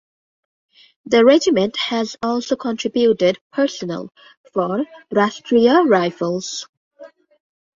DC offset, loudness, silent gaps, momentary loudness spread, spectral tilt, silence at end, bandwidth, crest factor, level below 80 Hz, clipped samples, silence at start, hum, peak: under 0.1%; -18 LUFS; 3.41-3.50 s, 4.37-4.44 s, 6.69-6.91 s; 14 LU; -4.5 dB/octave; 0.7 s; 7.6 kHz; 18 dB; -62 dBFS; under 0.1%; 1.05 s; none; -2 dBFS